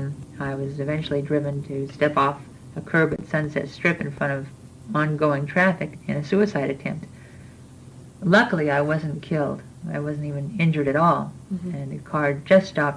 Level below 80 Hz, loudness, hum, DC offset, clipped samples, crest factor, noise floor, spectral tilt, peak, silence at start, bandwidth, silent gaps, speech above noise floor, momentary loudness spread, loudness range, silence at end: -56 dBFS; -23 LUFS; none; under 0.1%; under 0.1%; 20 dB; -44 dBFS; -7.5 dB/octave; -4 dBFS; 0 s; 10.5 kHz; none; 21 dB; 13 LU; 2 LU; 0 s